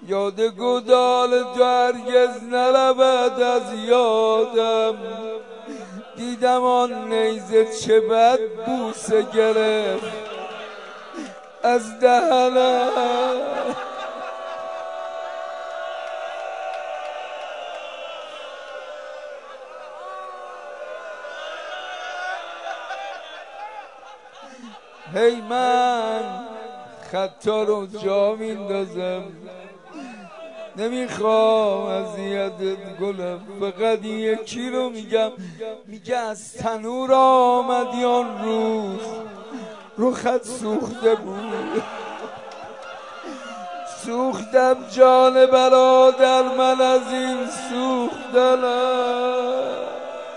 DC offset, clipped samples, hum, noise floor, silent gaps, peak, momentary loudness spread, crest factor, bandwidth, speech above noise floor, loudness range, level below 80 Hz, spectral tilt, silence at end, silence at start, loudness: 0.1%; under 0.1%; none; -43 dBFS; none; -2 dBFS; 19 LU; 20 dB; 11 kHz; 24 dB; 15 LU; -70 dBFS; -4 dB/octave; 0 s; 0 s; -20 LUFS